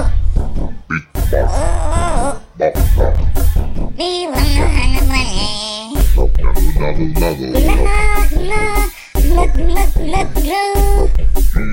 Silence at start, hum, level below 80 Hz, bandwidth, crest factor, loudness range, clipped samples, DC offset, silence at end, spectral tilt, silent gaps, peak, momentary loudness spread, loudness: 0 s; none; -14 dBFS; 16.5 kHz; 10 dB; 1 LU; under 0.1%; under 0.1%; 0 s; -5 dB/octave; none; 0 dBFS; 6 LU; -17 LUFS